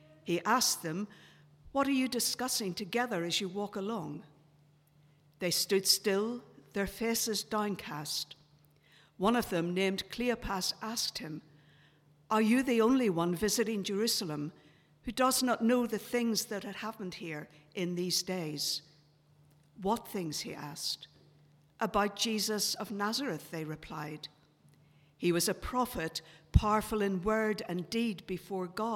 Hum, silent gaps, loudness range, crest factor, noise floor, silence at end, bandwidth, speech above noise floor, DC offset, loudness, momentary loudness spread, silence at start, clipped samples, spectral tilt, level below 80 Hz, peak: none; none; 5 LU; 24 dB; -65 dBFS; 0 s; 17 kHz; 32 dB; under 0.1%; -33 LUFS; 13 LU; 0.25 s; under 0.1%; -3.5 dB/octave; -52 dBFS; -10 dBFS